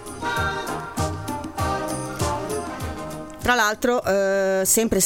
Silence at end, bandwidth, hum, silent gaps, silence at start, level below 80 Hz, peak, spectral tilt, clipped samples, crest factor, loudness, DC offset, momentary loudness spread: 0 s; 17 kHz; none; none; 0 s; -42 dBFS; -4 dBFS; -3.5 dB/octave; under 0.1%; 18 dB; -23 LUFS; under 0.1%; 12 LU